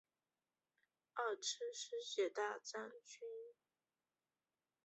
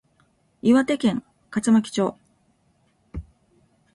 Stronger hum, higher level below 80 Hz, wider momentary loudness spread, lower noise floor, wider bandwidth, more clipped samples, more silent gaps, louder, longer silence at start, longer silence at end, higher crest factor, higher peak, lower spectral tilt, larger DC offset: neither; second, under -90 dBFS vs -50 dBFS; second, 13 LU vs 21 LU; first, under -90 dBFS vs -65 dBFS; second, 8 kHz vs 11.5 kHz; neither; neither; second, -45 LUFS vs -22 LUFS; first, 1.15 s vs 0.65 s; first, 1.3 s vs 0.7 s; about the same, 20 dB vs 18 dB; second, -28 dBFS vs -8 dBFS; second, 1 dB/octave vs -5.5 dB/octave; neither